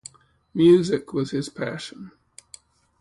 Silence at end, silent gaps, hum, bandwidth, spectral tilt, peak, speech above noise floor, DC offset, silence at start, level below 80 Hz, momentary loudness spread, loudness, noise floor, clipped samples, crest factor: 0.9 s; none; none; 11.5 kHz; -6.5 dB/octave; -6 dBFS; 29 dB; under 0.1%; 0.55 s; -60 dBFS; 27 LU; -22 LUFS; -51 dBFS; under 0.1%; 18 dB